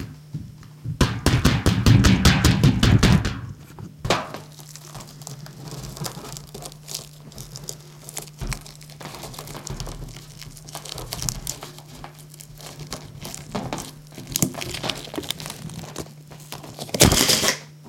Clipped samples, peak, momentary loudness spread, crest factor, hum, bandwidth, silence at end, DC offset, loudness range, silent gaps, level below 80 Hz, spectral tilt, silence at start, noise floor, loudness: under 0.1%; 0 dBFS; 23 LU; 24 dB; none; 17 kHz; 0 s; under 0.1%; 16 LU; none; -34 dBFS; -4 dB/octave; 0 s; -42 dBFS; -21 LUFS